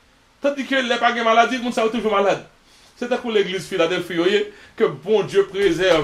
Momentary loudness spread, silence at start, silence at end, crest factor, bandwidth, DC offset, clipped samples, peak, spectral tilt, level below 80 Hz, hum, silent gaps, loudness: 8 LU; 0.45 s; 0 s; 18 dB; 14 kHz; under 0.1%; under 0.1%; -2 dBFS; -4.5 dB/octave; -52 dBFS; none; none; -20 LUFS